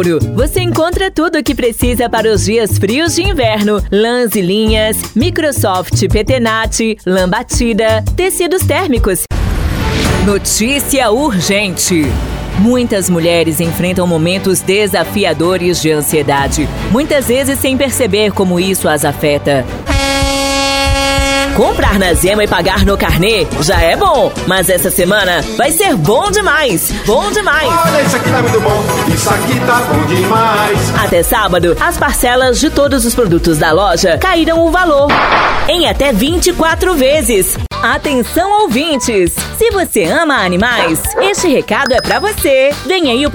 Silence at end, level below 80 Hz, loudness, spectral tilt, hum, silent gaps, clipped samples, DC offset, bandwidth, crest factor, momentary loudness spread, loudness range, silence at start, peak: 0 s; -24 dBFS; -11 LUFS; -4 dB/octave; none; none; under 0.1%; under 0.1%; over 20 kHz; 10 dB; 3 LU; 2 LU; 0 s; 0 dBFS